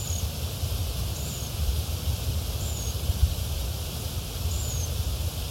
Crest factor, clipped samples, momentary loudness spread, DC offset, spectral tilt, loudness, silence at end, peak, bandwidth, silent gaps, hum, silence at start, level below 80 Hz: 18 dB; under 0.1%; 4 LU; under 0.1%; -4 dB/octave; -30 LUFS; 0 s; -10 dBFS; 16.5 kHz; none; none; 0 s; -32 dBFS